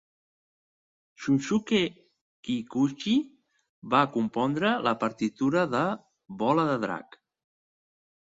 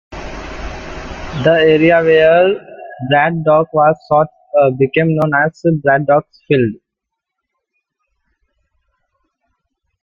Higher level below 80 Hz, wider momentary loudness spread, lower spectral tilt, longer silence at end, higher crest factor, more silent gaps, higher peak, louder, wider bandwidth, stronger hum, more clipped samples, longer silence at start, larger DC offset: second, -68 dBFS vs -40 dBFS; second, 10 LU vs 18 LU; second, -6 dB/octave vs -7.5 dB/octave; second, 1.25 s vs 3.3 s; first, 22 dB vs 14 dB; first, 2.21-2.43 s, 3.69-3.82 s vs none; second, -8 dBFS vs -2 dBFS; second, -27 LUFS vs -13 LUFS; about the same, 7.8 kHz vs 7.2 kHz; neither; neither; first, 1.2 s vs 0.1 s; neither